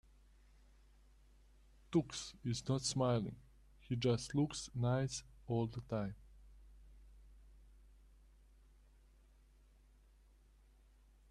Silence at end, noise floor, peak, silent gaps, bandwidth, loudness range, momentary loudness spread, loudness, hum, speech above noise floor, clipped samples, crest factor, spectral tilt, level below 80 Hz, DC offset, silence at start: 3.7 s; -66 dBFS; -22 dBFS; none; 12 kHz; 8 LU; 11 LU; -39 LUFS; none; 28 dB; under 0.1%; 20 dB; -5.5 dB/octave; -62 dBFS; under 0.1%; 1.9 s